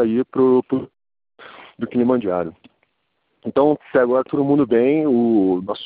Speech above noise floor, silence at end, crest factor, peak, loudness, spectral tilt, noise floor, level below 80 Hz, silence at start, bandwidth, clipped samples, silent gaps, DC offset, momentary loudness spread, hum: 53 dB; 0 s; 16 dB; -4 dBFS; -18 LUFS; -6.5 dB/octave; -70 dBFS; -60 dBFS; 0 s; 4.7 kHz; under 0.1%; none; under 0.1%; 9 LU; none